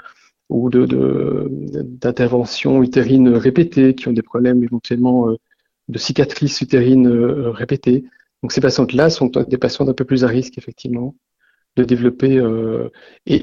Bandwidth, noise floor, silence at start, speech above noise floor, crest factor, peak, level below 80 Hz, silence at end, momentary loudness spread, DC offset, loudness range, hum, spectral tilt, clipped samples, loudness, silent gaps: 7.4 kHz; -45 dBFS; 0.5 s; 30 dB; 16 dB; 0 dBFS; -48 dBFS; 0 s; 12 LU; under 0.1%; 4 LU; none; -7 dB/octave; under 0.1%; -16 LUFS; none